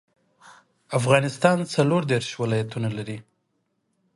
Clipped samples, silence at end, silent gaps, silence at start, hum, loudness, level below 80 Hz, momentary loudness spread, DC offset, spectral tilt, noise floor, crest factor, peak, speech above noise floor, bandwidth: under 0.1%; 0.95 s; none; 0.45 s; none; -23 LUFS; -64 dBFS; 11 LU; under 0.1%; -6 dB/octave; -73 dBFS; 22 dB; -4 dBFS; 51 dB; 11.5 kHz